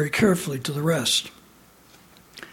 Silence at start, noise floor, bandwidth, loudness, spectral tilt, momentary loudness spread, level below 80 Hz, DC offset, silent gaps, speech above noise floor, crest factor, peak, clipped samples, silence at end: 0 s; -53 dBFS; 17.5 kHz; -23 LUFS; -4 dB/octave; 17 LU; -56 dBFS; under 0.1%; none; 30 dB; 20 dB; -6 dBFS; under 0.1%; 0.05 s